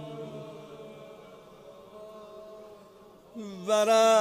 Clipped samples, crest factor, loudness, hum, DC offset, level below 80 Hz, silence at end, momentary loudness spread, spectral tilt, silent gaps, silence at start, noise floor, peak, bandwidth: under 0.1%; 18 dB; -26 LUFS; none; under 0.1%; -72 dBFS; 0 s; 27 LU; -3 dB/octave; none; 0 s; -54 dBFS; -12 dBFS; 15.5 kHz